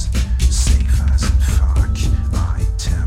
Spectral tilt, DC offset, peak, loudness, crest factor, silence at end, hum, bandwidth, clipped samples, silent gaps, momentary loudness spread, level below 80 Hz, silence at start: -5 dB/octave; under 0.1%; -4 dBFS; -17 LUFS; 12 dB; 0 s; none; 13.5 kHz; under 0.1%; none; 4 LU; -16 dBFS; 0 s